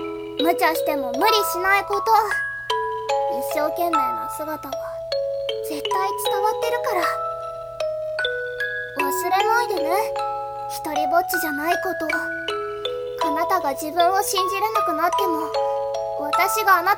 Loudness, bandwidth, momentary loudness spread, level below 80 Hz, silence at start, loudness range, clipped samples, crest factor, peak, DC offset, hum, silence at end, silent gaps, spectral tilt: -22 LUFS; 18 kHz; 9 LU; -56 dBFS; 0 s; 4 LU; under 0.1%; 18 dB; -4 dBFS; under 0.1%; none; 0 s; none; -2.5 dB/octave